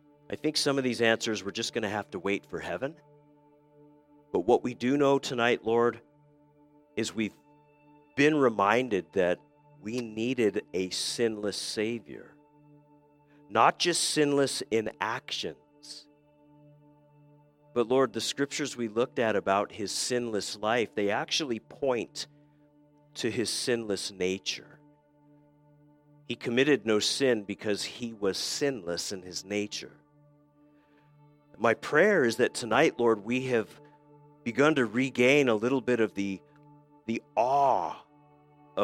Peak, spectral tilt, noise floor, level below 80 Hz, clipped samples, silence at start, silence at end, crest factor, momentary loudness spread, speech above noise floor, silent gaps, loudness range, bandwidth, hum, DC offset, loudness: -6 dBFS; -3.5 dB/octave; -62 dBFS; -72 dBFS; under 0.1%; 0.3 s; 0 s; 24 dB; 13 LU; 34 dB; none; 6 LU; 16.5 kHz; none; under 0.1%; -28 LUFS